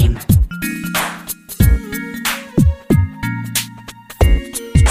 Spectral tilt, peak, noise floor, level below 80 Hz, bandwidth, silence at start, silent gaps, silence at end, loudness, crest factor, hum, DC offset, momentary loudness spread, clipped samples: -5 dB/octave; 0 dBFS; -35 dBFS; -20 dBFS; 16 kHz; 0 s; none; 0 s; -17 LUFS; 14 dB; none; under 0.1%; 11 LU; under 0.1%